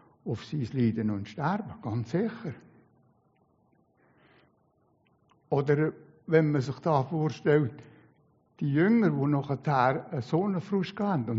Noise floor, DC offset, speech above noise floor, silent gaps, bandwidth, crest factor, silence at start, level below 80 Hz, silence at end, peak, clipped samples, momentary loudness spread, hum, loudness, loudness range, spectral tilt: -68 dBFS; under 0.1%; 41 dB; none; 7.6 kHz; 20 dB; 0.25 s; -68 dBFS; 0 s; -10 dBFS; under 0.1%; 10 LU; none; -28 LUFS; 11 LU; -7.5 dB/octave